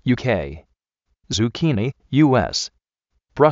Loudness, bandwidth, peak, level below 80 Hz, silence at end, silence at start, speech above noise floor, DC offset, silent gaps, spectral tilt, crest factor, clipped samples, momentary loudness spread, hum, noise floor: -20 LUFS; 8 kHz; -2 dBFS; -46 dBFS; 0 s; 0.05 s; 54 dB; under 0.1%; none; -5.5 dB/octave; 20 dB; under 0.1%; 13 LU; none; -73 dBFS